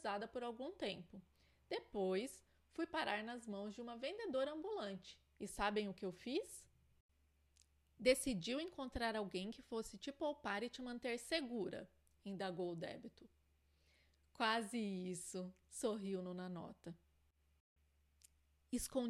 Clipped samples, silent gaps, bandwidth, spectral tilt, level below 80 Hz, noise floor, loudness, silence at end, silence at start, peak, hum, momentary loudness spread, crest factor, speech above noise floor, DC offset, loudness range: under 0.1%; 7.00-7.09 s, 17.60-17.76 s; 14.5 kHz; -4 dB/octave; -68 dBFS; -78 dBFS; -44 LUFS; 0 s; 0 s; -22 dBFS; none; 14 LU; 24 dB; 33 dB; under 0.1%; 5 LU